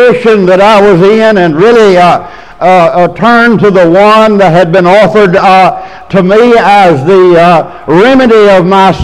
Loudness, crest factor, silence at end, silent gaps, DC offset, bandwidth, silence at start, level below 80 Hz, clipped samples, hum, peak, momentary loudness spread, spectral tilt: -4 LUFS; 4 dB; 0 s; none; 2%; 12.5 kHz; 0 s; -36 dBFS; 9%; none; 0 dBFS; 4 LU; -6.5 dB/octave